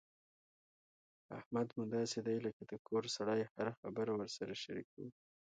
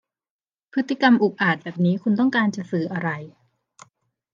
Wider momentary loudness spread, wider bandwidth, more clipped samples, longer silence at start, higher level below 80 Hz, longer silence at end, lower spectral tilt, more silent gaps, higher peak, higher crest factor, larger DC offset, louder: first, 15 LU vs 10 LU; first, 9 kHz vs 7.4 kHz; neither; first, 1.3 s vs 0.75 s; second, -80 dBFS vs -74 dBFS; second, 0.3 s vs 1.05 s; second, -5 dB/octave vs -7 dB/octave; first, 1.46-1.51 s, 2.53-2.60 s, 2.79-2.85 s, 3.51-3.55 s, 3.77-3.83 s, 4.84-4.97 s vs none; second, -26 dBFS vs -4 dBFS; about the same, 18 dB vs 20 dB; neither; second, -41 LUFS vs -21 LUFS